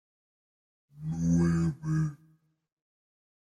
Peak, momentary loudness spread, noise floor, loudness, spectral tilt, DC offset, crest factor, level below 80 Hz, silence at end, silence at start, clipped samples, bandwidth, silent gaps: -16 dBFS; 11 LU; -66 dBFS; -29 LUFS; -8 dB/octave; under 0.1%; 16 dB; -56 dBFS; 1.25 s; 0.95 s; under 0.1%; 9.8 kHz; none